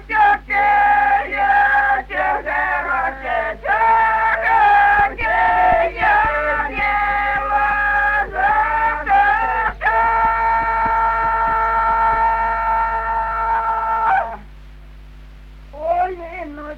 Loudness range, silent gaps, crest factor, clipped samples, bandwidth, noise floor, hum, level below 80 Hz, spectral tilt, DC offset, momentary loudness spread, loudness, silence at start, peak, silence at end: 5 LU; none; 14 dB; under 0.1%; 6.2 kHz; -38 dBFS; none; -36 dBFS; -5.5 dB/octave; under 0.1%; 7 LU; -16 LUFS; 0 s; -4 dBFS; 0 s